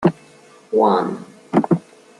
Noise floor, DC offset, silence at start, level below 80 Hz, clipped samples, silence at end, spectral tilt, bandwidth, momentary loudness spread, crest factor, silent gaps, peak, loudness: -47 dBFS; under 0.1%; 0 s; -62 dBFS; under 0.1%; 0.4 s; -8.5 dB/octave; 11 kHz; 9 LU; 18 dB; none; -2 dBFS; -19 LUFS